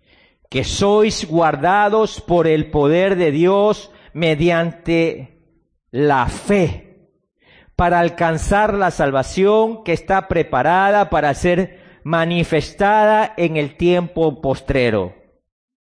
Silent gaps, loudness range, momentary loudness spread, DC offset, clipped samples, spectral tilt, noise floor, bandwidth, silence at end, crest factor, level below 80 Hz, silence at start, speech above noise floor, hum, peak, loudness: none; 3 LU; 8 LU; under 0.1%; under 0.1%; -6 dB/octave; -61 dBFS; 10.5 kHz; 0.8 s; 12 dB; -36 dBFS; 0.5 s; 45 dB; none; -6 dBFS; -17 LUFS